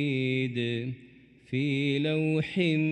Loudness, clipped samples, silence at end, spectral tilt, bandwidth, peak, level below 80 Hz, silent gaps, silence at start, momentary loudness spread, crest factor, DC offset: -29 LUFS; under 0.1%; 0 s; -7.5 dB/octave; 9.2 kHz; -14 dBFS; -68 dBFS; none; 0 s; 8 LU; 14 dB; under 0.1%